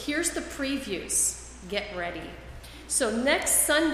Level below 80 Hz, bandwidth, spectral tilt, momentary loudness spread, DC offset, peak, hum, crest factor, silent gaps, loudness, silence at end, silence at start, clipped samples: -48 dBFS; 15.5 kHz; -1.5 dB/octave; 20 LU; under 0.1%; -8 dBFS; none; 20 dB; none; -26 LUFS; 0 s; 0 s; under 0.1%